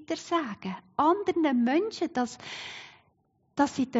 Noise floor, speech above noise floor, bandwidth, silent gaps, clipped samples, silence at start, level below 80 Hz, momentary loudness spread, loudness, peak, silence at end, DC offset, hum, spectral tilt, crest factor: -70 dBFS; 42 dB; 8 kHz; none; under 0.1%; 0 s; -70 dBFS; 14 LU; -28 LUFS; -10 dBFS; 0 s; under 0.1%; none; -3.5 dB/octave; 18 dB